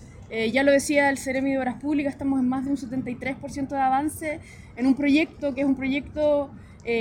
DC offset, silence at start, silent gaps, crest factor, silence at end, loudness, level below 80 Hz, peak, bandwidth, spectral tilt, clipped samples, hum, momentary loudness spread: under 0.1%; 0 s; none; 16 dB; 0 s; -24 LUFS; -50 dBFS; -8 dBFS; 16 kHz; -5 dB/octave; under 0.1%; none; 12 LU